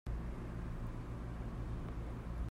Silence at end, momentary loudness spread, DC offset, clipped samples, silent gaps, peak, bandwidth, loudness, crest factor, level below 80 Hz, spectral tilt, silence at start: 0 s; 1 LU; under 0.1%; under 0.1%; none; -30 dBFS; 11.5 kHz; -45 LUFS; 12 dB; -44 dBFS; -8 dB/octave; 0.05 s